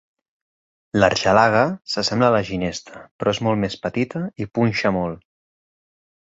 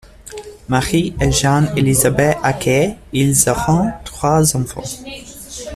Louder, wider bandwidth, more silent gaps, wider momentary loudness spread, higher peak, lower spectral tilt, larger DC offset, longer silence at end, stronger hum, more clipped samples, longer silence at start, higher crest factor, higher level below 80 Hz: second, -20 LUFS vs -15 LUFS; second, 8 kHz vs 15.5 kHz; first, 3.11-3.19 s vs none; second, 11 LU vs 18 LU; about the same, -2 dBFS vs 0 dBFS; about the same, -5.5 dB/octave vs -4.5 dB/octave; neither; first, 1.2 s vs 0 s; neither; neither; first, 0.95 s vs 0.25 s; about the same, 20 dB vs 16 dB; second, -50 dBFS vs -34 dBFS